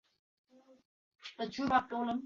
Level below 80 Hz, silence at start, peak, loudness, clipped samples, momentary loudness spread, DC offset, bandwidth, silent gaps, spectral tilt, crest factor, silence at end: -70 dBFS; 1.25 s; -16 dBFS; -34 LUFS; under 0.1%; 19 LU; under 0.1%; 7.4 kHz; none; -2.5 dB/octave; 22 dB; 0 s